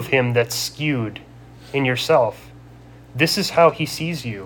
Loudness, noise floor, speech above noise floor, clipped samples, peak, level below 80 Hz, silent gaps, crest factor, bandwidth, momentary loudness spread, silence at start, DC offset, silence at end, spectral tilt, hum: -20 LUFS; -43 dBFS; 23 dB; under 0.1%; -2 dBFS; -52 dBFS; none; 18 dB; 19 kHz; 11 LU; 0 s; under 0.1%; 0 s; -4.5 dB/octave; none